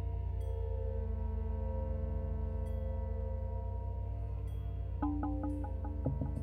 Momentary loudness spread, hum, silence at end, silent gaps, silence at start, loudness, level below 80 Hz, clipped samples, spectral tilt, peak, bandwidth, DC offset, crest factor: 3 LU; none; 0 s; none; 0 s; -39 LUFS; -40 dBFS; under 0.1%; -10.5 dB/octave; -20 dBFS; 3.5 kHz; under 0.1%; 16 dB